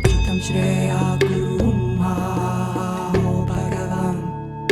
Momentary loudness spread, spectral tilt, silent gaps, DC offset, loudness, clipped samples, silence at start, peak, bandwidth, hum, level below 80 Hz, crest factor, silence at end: 5 LU; -6.5 dB/octave; none; under 0.1%; -21 LUFS; under 0.1%; 0 s; -2 dBFS; 14 kHz; none; -30 dBFS; 18 dB; 0 s